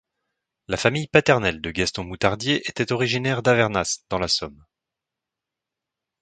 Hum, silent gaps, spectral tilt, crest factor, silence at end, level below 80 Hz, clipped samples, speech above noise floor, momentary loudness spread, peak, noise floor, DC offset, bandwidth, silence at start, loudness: none; none; -4 dB/octave; 24 dB; 1.7 s; -48 dBFS; under 0.1%; 64 dB; 7 LU; 0 dBFS; -86 dBFS; under 0.1%; 9.4 kHz; 0.7 s; -22 LUFS